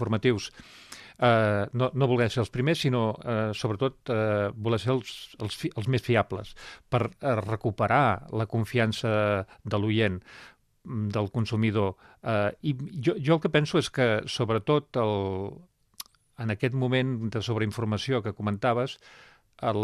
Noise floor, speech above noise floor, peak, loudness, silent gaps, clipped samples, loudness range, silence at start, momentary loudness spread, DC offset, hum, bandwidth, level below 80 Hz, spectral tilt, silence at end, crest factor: -48 dBFS; 21 dB; -8 dBFS; -27 LUFS; none; under 0.1%; 3 LU; 0 s; 12 LU; under 0.1%; none; 13.5 kHz; -58 dBFS; -6.5 dB/octave; 0 s; 20 dB